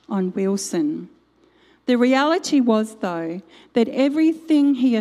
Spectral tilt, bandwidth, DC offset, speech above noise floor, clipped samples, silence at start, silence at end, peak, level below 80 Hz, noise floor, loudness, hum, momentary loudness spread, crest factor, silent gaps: -5 dB/octave; 13 kHz; under 0.1%; 38 dB; under 0.1%; 0.1 s; 0 s; -4 dBFS; -70 dBFS; -57 dBFS; -20 LUFS; none; 11 LU; 16 dB; none